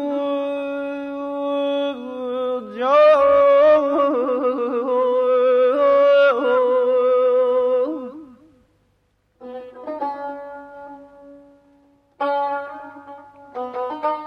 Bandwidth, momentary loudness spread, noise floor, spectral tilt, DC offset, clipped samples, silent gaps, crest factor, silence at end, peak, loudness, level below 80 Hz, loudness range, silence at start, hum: 6.2 kHz; 22 LU; -64 dBFS; -5.5 dB/octave; under 0.1%; under 0.1%; none; 14 dB; 0 s; -6 dBFS; -18 LUFS; -64 dBFS; 18 LU; 0 s; none